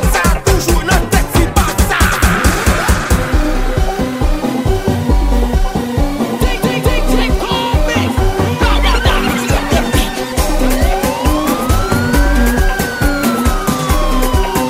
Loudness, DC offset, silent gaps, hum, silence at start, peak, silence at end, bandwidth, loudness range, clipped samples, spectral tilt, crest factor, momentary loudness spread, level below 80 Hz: -14 LUFS; under 0.1%; none; none; 0 s; 0 dBFS; 0 s; 16.5 kHz; 3 LU; under 0.1%; -5 dB/octave; 12 dB; 4 LU; -16 dBFS